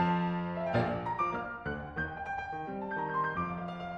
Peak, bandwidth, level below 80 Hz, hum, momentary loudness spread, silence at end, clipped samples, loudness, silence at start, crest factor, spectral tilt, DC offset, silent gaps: -16 dBFS; 6.6 kHz; -56 dBFS; none; 7 LU; 0 s; under 0.1%; -34 LUFS; 0 s; 18 dB; -8 dB/octave; under 0.1%; none